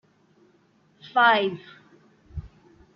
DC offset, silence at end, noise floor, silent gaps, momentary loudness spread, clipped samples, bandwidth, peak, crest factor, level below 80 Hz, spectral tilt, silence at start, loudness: under 0.1%; 0.5 s; -62 dBFS; none; 23 LU; under 0.1%; 6.6 kHz; -6 dBFS; 22 dB; -52 dBFS; -1.5 dB/octave; 1.05 s; -21 LUFS